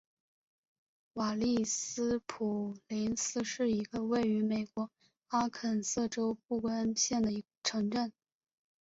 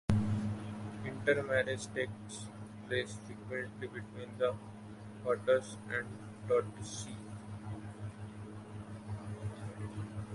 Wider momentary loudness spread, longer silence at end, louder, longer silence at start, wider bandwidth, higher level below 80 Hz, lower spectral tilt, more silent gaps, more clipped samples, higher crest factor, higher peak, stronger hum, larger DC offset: second, 6 LU vs 14 LU; first, 0.7 s vs 0 s; first, -34 LUFS vs -38 LUFS; first, 1.15 s vs 0.1 s; second, 8 kHz vs 11.5 kHz; second, -66 dBFS vs -56 dBFS; second, -4 dB/octave vs -5.5 dB/octave; first, 7.57-7.62 s vs none; neither; second, 16 dB vs 24 dB; second, -20 dBFS vs -14 dBFS; neither; neither